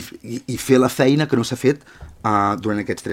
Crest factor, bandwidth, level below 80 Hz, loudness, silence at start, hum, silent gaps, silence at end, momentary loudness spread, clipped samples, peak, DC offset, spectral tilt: 18 dB; 16.5 kHz; -50 dBFS; -19 LUFS; 0 s; none; none; 0 s; 12 LU; under 0.1%; -2 dBFS; under 0.1%; -5.5 dB/octave